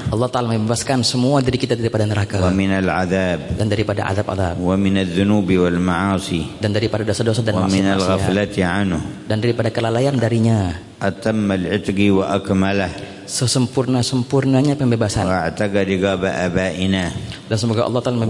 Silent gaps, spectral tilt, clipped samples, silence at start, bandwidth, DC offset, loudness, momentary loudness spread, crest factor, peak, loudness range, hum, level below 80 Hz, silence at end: none; -6 dB/octave; under 0.1%; 0 s; 11.5 kHz; under 0.1%; -18 LUFS; 5 LU; 14 dB; -4 dBFS; 1 LU; none; -44 dBFS; 0 s